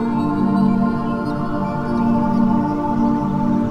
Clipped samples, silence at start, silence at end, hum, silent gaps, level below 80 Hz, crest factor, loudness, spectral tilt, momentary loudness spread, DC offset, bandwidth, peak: under 0.1%; 0 s; 0 s; none; none; -38 dBFS; 12 dB; -19 LUFS; -9.5 dB/octave; 5 LU; under 0.1%; 6.2 kHz; -4 dBFS